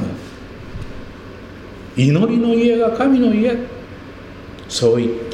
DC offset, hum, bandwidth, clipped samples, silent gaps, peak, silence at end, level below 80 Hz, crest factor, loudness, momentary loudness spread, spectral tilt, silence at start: under 0.1%; none; 11 kHz; under 0.1%; none; -2 dBFS; 0 s; -42 dBFS; 16 dB; -16 LUFS; 21 LU; -6.5 dB/octave; 0 s